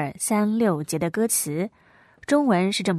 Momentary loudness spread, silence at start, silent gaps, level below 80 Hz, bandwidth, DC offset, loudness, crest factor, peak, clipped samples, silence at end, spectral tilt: 9 LU; 0 s; none; -64 dBFS; 14 kHz; under 0.1%; -23 LUFS; 16 dB; -8 dBFS; under 0.1%; 0 s; -4.5 dB/octave